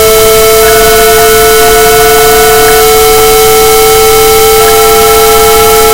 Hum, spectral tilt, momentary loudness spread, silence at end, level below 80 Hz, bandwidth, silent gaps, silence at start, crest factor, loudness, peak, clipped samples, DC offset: none; -1.5 dB/octave; 0 LU; 0 s; -20 dBFS; over 20 kHz; none; 0 s; 2 dB; -2 LUFS; 0 dBFS; 20%; under 0.1%